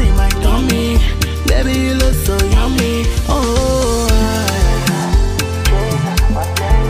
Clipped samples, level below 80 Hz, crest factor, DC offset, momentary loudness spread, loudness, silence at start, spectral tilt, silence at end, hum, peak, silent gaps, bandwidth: under 0.1%; -16 dBFS; 10 dB; under 0.1%; 2 LU; -15 LUFS; 0 s; -5 dB/octave; 0 s; none; -2 dBFS; none; 16 kHz